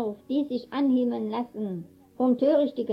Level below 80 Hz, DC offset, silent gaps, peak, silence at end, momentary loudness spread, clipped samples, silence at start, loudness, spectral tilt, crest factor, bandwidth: -72 dBFS; under 0.1%; none; -12 dBFS; 0 s; 11 LU; under 0.1%; 0 s; -26 LUFS; -8.5 dB/octave; 14 dB; 5.6 kHz